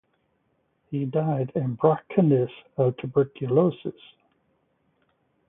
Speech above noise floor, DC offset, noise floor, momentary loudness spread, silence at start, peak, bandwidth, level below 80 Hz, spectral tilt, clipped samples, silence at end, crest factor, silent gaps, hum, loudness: 47 dB; under 0.1%; -71 dBFS; 9 LU; 0.9 s; -6 dBFS; 3.8 kHz; -66 dBFS; -13 dB/octave; under 0.1%; 1.6 s; 20 dB; none; none; -24 LUFS